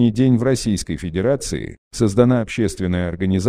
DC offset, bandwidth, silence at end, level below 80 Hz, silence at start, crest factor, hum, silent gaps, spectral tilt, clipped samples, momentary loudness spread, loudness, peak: under 0.1%; 14 kHz; 0 s; -40 dBFS; 0 s; 16 dB; none; 1.78-1.91 s; -6.5 dB/octave; under 0.1%; 9 LU; -19 LUFS; -2 dBFS